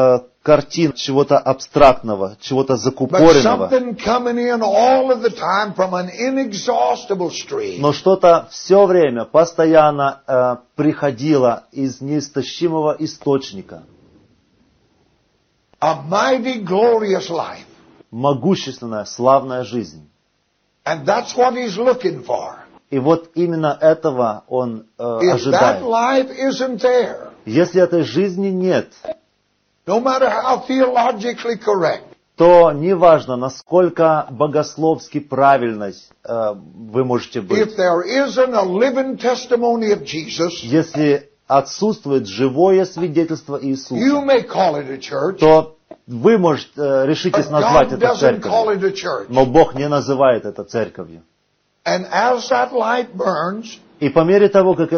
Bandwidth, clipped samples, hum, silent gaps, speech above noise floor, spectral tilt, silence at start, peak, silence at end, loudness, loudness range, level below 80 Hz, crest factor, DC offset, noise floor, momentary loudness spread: 6.6 kHz; under 0.1%; none; none; 50 dB; -5 dB/octave; 0 s; 0 dBFS; 0 s; -16 LUFS; 6 LU; -48 dBFS; 16 dB; under 0.1%; -65 dBFS; 12 LU